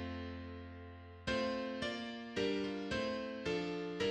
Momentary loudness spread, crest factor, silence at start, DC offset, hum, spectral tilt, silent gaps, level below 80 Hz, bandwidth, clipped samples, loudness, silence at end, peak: 12 LU; 16 dB; 0 s; under 0.1%; none; -5 dB/octave; none; -60 dBFS; 10.5 kHz; under 0.1%; -40 LUFS; 0 s; -24 dBFS